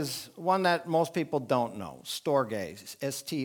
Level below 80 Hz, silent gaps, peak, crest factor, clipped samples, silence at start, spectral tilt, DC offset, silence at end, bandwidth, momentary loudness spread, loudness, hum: -72 dBFS; none; -10 dBFS; 20 dB; under 0.1%; 0 s; -4.5 dB/octave; under 0.1%; 0 s; 19.5 kHz; 10 LU; -30 LUFS; none